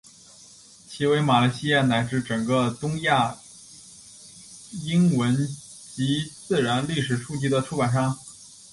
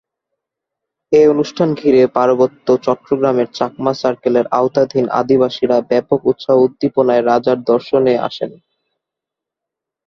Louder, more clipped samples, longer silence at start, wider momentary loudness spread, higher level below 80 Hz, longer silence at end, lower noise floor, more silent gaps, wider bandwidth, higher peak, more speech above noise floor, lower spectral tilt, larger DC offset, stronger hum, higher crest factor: second, -24 LUFS vs -14 LUFS; neither; second, 0.9 s vs 1.1 s; first, 23 LU vs 6 LU; about the same, -58 dBFS vs -56 dBFS; second, 0.25 s vs 1.6 s; second, -50 dBFS vs -83 dBFS; neither; first, 11.5 kHz vs 6.8 kHz; second, -6 dBFS vs 0 dBFS; second, 27 dB vs 70 dB; second, -5.5 dB/octave vs -7 dB/octave; neither; neither; about the same, 18 dB vs 14 dB